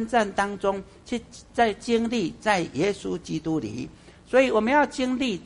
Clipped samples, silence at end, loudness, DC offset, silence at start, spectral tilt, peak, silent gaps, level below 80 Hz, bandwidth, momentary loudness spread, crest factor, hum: under 0.1%; 0 s; -25 LUFS; under 0.1%; 0 s; -5 dB/octave; -6 dBFS; none; -52 dBFS; 11 kHz; 13 LU; 18 dB; none